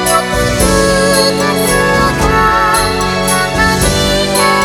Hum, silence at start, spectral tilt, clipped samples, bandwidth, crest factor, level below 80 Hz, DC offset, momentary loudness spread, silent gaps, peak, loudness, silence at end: none; 0 s; -3.5 dB/octave; under 0.1%; 18.5 kHz; 10 dB; -24 dBFS; under 0.1%; 2 LU; none; 0 dBFS; -10 LUFS; 0 s